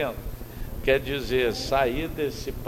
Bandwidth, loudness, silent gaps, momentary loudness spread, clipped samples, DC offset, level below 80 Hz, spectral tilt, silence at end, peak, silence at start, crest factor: 16.5 kHz; -26 LUFS; none; 14 LU; under 0.1%; under 0.1%; -38 dBFS; -5 dB/octave; 0 s; -8 dBFS; 0 s; 18 dB